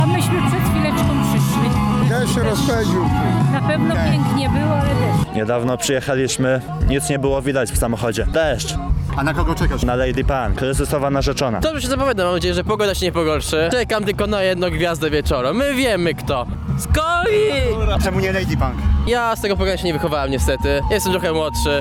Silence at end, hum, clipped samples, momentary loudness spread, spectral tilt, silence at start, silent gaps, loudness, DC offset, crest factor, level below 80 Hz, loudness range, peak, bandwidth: 0 s; none; under 0.1%; 3 LU; -5.5 dB/octave; 0 s; none; -18 LUFS; 0.2%; 14 dB; -26 dBFS; 2 LU; -4 dBFS; 18.5 kHz